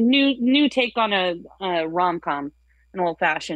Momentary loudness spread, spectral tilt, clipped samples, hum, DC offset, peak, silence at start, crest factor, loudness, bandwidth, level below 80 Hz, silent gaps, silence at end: 11 LU; -5 dB/octave; under 0.1%; none; under 0.1%; -6 dBFS; 0 s; 16 dB; -21 LUFS; 9 kHz; -60 dBFS; none; 0 s